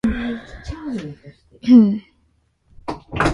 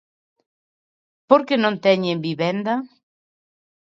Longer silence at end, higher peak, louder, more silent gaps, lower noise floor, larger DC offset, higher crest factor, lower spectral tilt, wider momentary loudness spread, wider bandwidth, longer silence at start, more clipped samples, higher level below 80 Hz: second, 0 s vs 1.15 s; about the same, -2 dBFS vs 0 dBFS; about the same, -18 LUFS vs -20 LUFS; neither; second, -62 dBFS vs under -90 dBFS; neither; about the same, 18 dB vs 22 dB; about the same, -7 dB/octave vs -7 dB/octave; first, 22 LU vs 8 LU; first, 11.5 kHz vs 7.4 kHz; second, 0.05 s vs 1.3 s; neither; first, -38 dBFS vs -70 dBFS